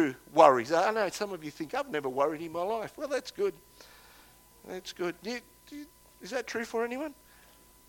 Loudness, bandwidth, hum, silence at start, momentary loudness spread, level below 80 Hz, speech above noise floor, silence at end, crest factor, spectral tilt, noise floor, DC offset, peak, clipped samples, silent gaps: -30 LUFS; 17.5 kHz; 60 Hz at -70 dBFS; 0 s; 20 LU; -68 dBFS; 28 dB; 0.75 s; 26 dB; -4 dB/octave; -58 dBFS; under 0.1%; -6 dBFS; under 0.1%; none